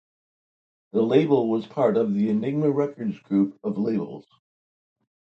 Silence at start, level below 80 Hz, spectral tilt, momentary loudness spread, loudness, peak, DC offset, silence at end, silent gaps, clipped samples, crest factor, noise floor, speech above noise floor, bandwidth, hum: 0.95 s; -72 dBFS; -9.5 dB/octave; 9 LU; -24 LUFS; -4 dBFS; under 0.1%; 1.05 s; none; under 0.1%; 20 dB; under -90 dBFS; over 67 dB; 6.4 kHz; none